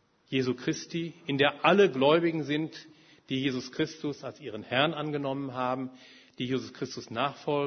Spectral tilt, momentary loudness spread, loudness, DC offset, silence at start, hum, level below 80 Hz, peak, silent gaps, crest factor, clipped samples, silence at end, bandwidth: -5.5 dB/octave; 15 LU; -29 LUFS; under 0.1%; 0.3 s; none; -70 dBFS; -8 dBFS; none; 22 dB; under 0.1%; 0 s; 6.6 kHz